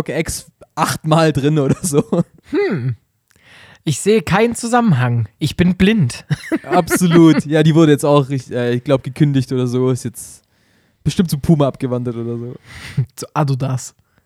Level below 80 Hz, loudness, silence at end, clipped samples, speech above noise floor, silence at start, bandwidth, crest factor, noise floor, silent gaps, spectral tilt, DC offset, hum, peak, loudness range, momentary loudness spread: -44 dBFS; -16 LUFS; 0.35 s; under 0.1%; 42 dB; 0 s; 15.5 kHz; 16 dB; -57 dBFS; none; -6 dB/octave; under 0.1%; none; 0 dBFS; 6 LU; 14 LU